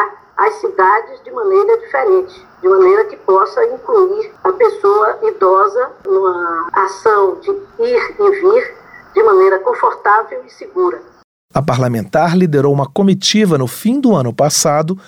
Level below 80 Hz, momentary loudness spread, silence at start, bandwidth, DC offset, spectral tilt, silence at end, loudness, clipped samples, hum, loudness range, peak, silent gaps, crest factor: -54 dBFS; 8 LU; 0 s; 16.5 kHz; under 0.1%; -5 dB/octave; 0.1 s; -13 LUFS; under 0.1%; none; 2 LU; -2 dBFS; 11.24-11.49 s; 12 dB